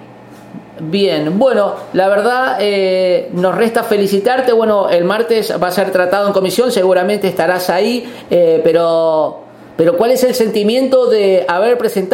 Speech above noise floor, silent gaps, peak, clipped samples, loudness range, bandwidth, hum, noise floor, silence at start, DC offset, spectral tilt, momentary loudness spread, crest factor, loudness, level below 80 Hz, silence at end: 24 dB; none; 0 dBFS; under 0.1%; 1 LU; 17 kHz; none; -36 dBFS; 0 s; under 0.1%; -5 dB/octave; 4 LU; 12 dB; -13 LUFS; -58 dBFS; 0 s